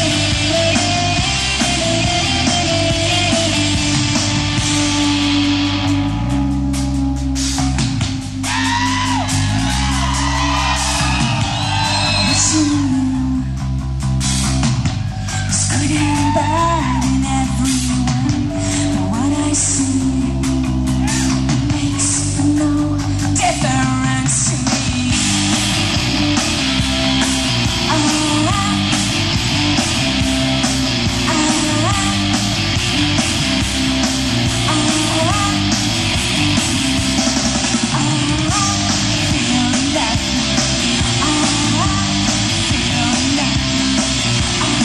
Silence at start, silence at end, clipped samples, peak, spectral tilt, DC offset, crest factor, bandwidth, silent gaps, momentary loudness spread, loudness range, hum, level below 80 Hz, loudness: 0 s; 0 s; under 0.1%; 0 dBFS; -3.5 dB/octave; under 0.1%; 16 dB; 14 kHz; none; 3 LU; 2 LU; none; -28 dBFS; -15 LUFS